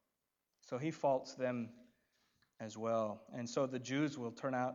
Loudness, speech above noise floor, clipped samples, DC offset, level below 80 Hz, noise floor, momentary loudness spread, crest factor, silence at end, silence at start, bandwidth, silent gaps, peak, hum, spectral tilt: -40 LUFS; 49 dB; under 0.1%; under 0.1%; -88 dBFS; -88 dBFS; 10 LU; 18 dB; 0 s; 0.65 s; 7.8 kHz; none; -22 dBFS; none; -5.5 dB/octave